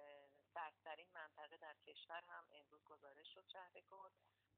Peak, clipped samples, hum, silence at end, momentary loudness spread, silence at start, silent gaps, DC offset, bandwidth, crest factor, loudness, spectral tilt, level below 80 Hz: -40 dBFS; under 0.1%; none; 0.25 s; 12 LU; 0 s; none; under 0.1%; 4.3 kHz; 22 dB; -59 LUFS; 1.5 dB/octave; under -90 dBFS